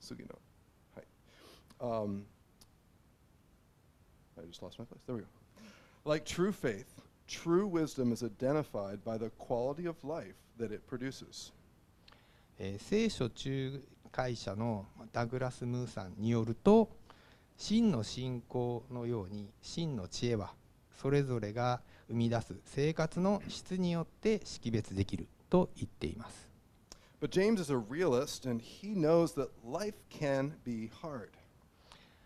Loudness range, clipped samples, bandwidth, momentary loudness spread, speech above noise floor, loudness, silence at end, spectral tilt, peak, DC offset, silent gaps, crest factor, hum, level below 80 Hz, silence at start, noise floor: 12 LU; under 0.1%; 14.5 kHz; 15 LU; 31 dB; -36 LUFS; 0.3 s; -6.5 dB/octave; -14 dBFS; under 0.1%; none; 22 dB; none; -60 dBFS; 0 s; -66 dBFS